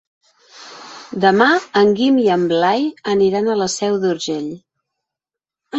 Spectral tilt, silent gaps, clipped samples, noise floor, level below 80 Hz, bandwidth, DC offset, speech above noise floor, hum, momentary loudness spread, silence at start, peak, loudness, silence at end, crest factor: -4.5 dB/octave; none; under 0.1%; -87 dBFS; -60 dBFS; 8.2 kHz; under 0.1%; 71 dB; none; 21 LU; 0.55 s; -2 dBFS; -16 LUFS; 0 s; 16 dB